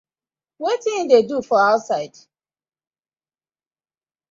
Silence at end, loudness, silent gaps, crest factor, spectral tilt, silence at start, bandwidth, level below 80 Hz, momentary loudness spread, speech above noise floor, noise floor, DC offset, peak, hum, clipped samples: 2.25 s; -19 LUFS; none; 20 dB; -4 dB/octave; 0.6 s; 7.6 kHz; -70 dBFS; 10 LU; over 72 dB; under -90 dBFS; under 0.1%; -2 dBFS; none; under 0.1%